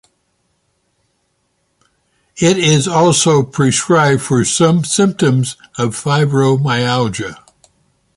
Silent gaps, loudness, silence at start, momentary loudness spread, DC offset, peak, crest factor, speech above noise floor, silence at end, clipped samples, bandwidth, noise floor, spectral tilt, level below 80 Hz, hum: none; -13 LUFS; 2.35 s; 8 LU; under 0.1%; 0 dBFS; 16 dB; 52 dB; 0.85 s; under 0.1%; 11.5 kHz; -65 dBFS; -4.5 dB/octave; -50 dBFS; none